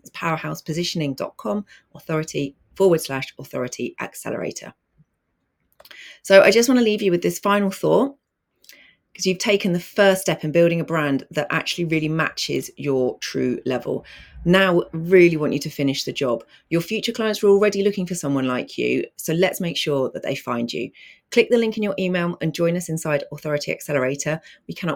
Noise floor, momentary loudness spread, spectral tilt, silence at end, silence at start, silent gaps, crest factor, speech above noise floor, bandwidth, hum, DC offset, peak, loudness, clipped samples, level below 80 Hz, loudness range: -73 dBFS; 12 LU; -5 dB/octave; 0 s; 0.15 s; none; 20 dB; 52 dB; 19.5 kHz; none; under 0.1%; 0 dBFS; -21 LUFS; under 0.1%; -56 dBFS; 6 LU